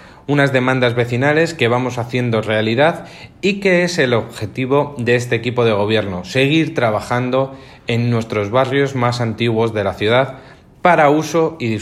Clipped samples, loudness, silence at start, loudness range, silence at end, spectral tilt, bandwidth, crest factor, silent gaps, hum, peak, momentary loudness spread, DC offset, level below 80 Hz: under 0.1%; -16 LUFS; 0 s; 2 LU; 0 s; -6 dB/octave; 13.5 kHz; 16 dB; none; none; 0 dBFS; 6 LU; under 0.1%; -52 dBFS